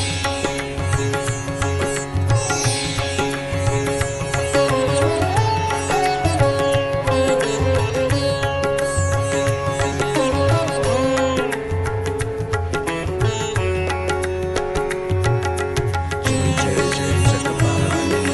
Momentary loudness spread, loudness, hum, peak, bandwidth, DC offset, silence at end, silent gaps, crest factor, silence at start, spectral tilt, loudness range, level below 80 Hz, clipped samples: 5 LU; -20 LUFS; none; -2 dBFS; 12 kHz; under 0.1%; 0 s; none; 18 dB; 0 s; -5 dB/octave; 3 LU; -34 dBFS; under 0.1%